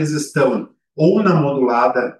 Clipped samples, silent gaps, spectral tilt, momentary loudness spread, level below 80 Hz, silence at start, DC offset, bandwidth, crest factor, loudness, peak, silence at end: under 0.1%; none; -6.5 dB/octave; 7 LU; -66 dBFS; 0 s; under 0.1%; 12.5 kHz; 14 dB; -16 LUFS; -2 dBFS; 0.05 s